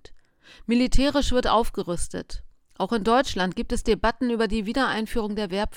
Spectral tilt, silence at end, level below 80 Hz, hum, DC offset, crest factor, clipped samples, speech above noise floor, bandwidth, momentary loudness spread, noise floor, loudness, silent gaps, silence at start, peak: -4.5 dB/octave; 0 s; -32 dBFS; none; under 0.1%; 16 dB; under 0.1%; 27 dB; 15.5 kHz; 10 LU; -50 dBFS; -24 LUFS; none; 0.1 s; -8 dBFS